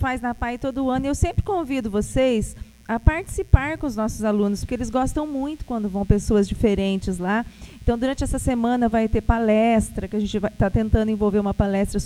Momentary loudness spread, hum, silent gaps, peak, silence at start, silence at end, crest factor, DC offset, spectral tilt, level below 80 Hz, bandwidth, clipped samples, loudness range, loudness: 7 LU; none; none; 0 dBFS; 0 s; 0 s; 22 dB; under 0.1%; -6.5 dB/octave; -30 dBFS; 14.5 kHz; under 0.1%; 2 LU; -22 LUFS